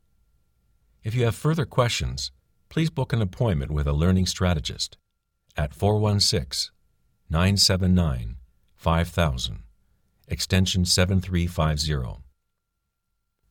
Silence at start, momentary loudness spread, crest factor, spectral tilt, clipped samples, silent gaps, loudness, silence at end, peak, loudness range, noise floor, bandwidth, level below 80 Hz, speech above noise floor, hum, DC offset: 1.05 s; 12 LU; 18 dB; -5 dB/octave; under 0.1%; none; -24 LUFS; 1.3 s; -8 dBFS; 3 LU; -78 dBFS; 18 kHz; -36 dBFS; 55 dB; none; under 0.1%